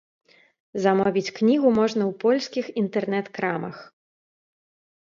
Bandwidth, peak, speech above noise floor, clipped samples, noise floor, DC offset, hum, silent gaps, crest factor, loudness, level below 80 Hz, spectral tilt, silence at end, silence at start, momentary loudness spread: 7.4 kHz; -6 dBFS; over 67 dB; under 0.1%; under -90 dBFS; under 0.1%; none; none; 18 dB; -23 LUFS; -66 dBFS; -6 dB/octave; 1.2 s; 0.75 s; 11 LU